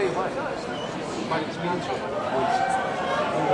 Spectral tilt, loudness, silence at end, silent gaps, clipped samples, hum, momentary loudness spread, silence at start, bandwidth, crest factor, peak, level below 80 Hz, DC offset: -5 dB/octave; -27 LUFS; 0 s; none; under 0.1%; none; 7 LU; 0 s; 11.5 kHz; 16 dB; -10 dBFS; -56 dBFS; under 0.1%